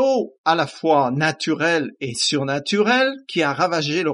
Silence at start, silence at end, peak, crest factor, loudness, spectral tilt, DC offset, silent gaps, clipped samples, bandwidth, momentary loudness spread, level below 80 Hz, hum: 0 s; 0 s; -2 dBFS; 18 dB; -20 LUFS; -4 dB/octave; under 0.1%; 0.38-0.44 s; under 0.1%; 11.5 kHz; 4 LU; -68 dBFS; none